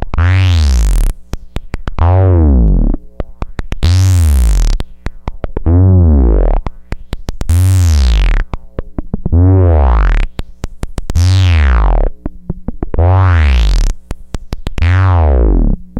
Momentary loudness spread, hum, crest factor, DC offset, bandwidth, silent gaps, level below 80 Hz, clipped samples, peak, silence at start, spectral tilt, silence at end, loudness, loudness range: 17 LU; none; 10 dB; under 0.1%; 12.5 kHz; none; -12 dBFS; under 0.1%; 0 dBFS; 0 s; -7 dB/octave; 0 s; -12 LUFS; 2 LU